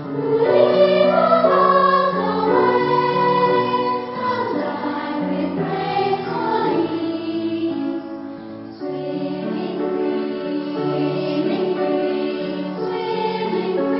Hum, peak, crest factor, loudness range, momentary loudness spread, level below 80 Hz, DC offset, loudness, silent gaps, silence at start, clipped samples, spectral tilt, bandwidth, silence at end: none; -2 dBFS; 16 dB; 9 LU; 11 LU; -60 dBFS; under 0.1%; -19 LUFS; none; 0 s; under 0.1%; -11 dB/octave; 5.8 kHz; 0 s